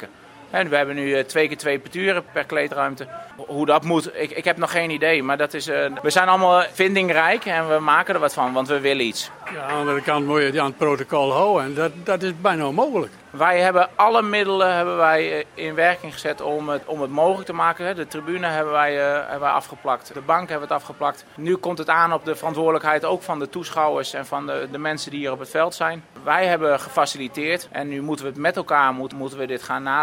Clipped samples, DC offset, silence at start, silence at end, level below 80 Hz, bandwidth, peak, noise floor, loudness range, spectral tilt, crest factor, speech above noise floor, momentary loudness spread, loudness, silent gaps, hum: under 0.1%; under 0.1%; 0 s; 0 s; -66 dBFS; 16.5 kHz; 0 dBFS; -41 dBFS; 4 LU; -4.5 dB/octave; 20 dB; 20 dB; 10 LU; -21 LUFS; none; none